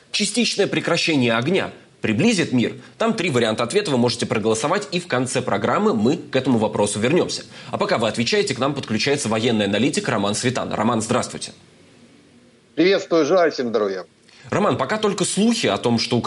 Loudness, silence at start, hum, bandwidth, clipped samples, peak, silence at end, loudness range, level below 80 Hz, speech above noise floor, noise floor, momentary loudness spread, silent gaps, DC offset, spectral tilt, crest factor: -20 LUFS; 0.15 s; none; 11.5 kHz; under 0.1%; -6 dBFS; 0 s; 2 LU; -60 dBFS; 32 dB; -52 dBFS; 6 LU; none; under 0.1%; -4.5 dB/octave; 14 dB